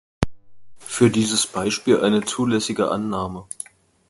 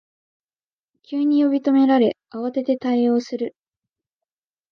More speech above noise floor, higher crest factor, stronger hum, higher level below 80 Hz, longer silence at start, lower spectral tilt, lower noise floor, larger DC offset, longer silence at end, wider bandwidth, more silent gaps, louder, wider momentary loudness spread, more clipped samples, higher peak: second, 22 dB vs over 71 dB; first, 22 dB vs 16 dB; neither; first, -46 dBFS vs -74 dBFS; second, 0.2 s vs 1.1 s; second, -4.5 dB/octave vs -6.5 dB/octave; second, -42 dBFS vs under -90 dBFS; neither; second, 0.65 s vs 1.2 s; first, 11.5 kHz vs 6.6 kHz; neither; about the same, -21 LUFS vs -20 LUFS; first, 16 LU vs 12 LU; neither; first, 0 dBFS vs -6 dBFS